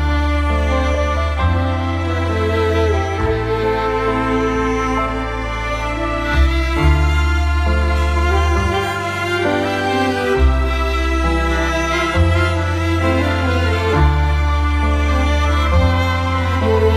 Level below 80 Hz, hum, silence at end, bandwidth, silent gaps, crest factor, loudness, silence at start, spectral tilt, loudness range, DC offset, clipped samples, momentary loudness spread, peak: -20 dBFS; none; 0 s; 12.5 kHz; none; 14 dB; -17 LUFS; 0 s; -6.5 dB/octave; 2 LU; under 0.1%; under 0.1%; 4 LU; -2 dBFS